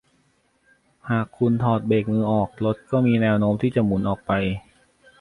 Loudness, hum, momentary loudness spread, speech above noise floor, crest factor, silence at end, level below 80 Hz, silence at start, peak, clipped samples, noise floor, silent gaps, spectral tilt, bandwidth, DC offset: -22 LUFS; none; 7 LU; 43 dB; 16 dB; 0.6 s; -48 dBFS; 1.05 s; -8 dBFS; under 0.1%; -64 dBFS; none; -9 dB/octave; 10.5 kHz; under 0.1%